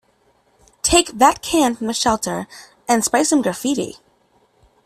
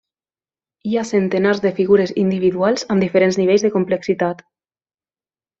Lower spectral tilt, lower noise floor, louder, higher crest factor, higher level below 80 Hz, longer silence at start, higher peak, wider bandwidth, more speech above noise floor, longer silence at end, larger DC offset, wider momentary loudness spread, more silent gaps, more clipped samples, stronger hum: second, -2.5 dB/octave vs -6 dB/octave; second, -60 dBFS vs under -90 dBFS; about the same, -18 LUFS vs -17 LUFS; about the same, 20 dB vs 16 dB; first, -44 dBFS vs -58 dBFS; about the same, 0.85 s vs 0.85 s; about the same, 0 dBFS vs -2 dBFS; first, 15 kHz vs 7.8 kHz; second, 42 dB vs over 74 dB; second, 0.9 s vs 1.25 s; neither; first, 12 LU vs 7 LU; neither; neither; neither